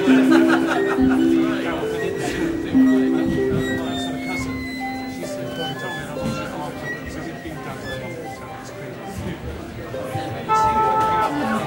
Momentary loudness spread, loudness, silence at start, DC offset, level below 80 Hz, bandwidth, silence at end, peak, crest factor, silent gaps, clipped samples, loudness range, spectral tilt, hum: 15 LU; -21 LUFS; 0 s; under 0.1%; -44 dBFS; 16.5 kHz; 0 s; -4 dBFS; 18 dB; none; under 0.1%; 11 LU; -6 dB/octave; none